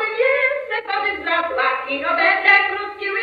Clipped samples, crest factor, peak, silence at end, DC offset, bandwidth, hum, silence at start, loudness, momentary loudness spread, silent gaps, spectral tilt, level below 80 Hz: under 0.1%; 18 dB; 0 dBFS; 0 s; under 0.1%; 6.8 kHz; 50 Hz at -75 dBFS; 0 s; -18 LUFS; 10 LU; none; -4 dB/octave; -60 dBFS